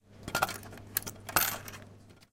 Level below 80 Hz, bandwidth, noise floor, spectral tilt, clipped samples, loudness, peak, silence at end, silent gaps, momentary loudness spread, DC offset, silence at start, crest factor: -58 dBFS; 17 kHz; -54 dBFS; -2 dB/octave; under 0.1%; -33 LUFS; -8 dBFS; 0.1 s; none; 16 LU; under 0.1%; 0.1 s; 28 dB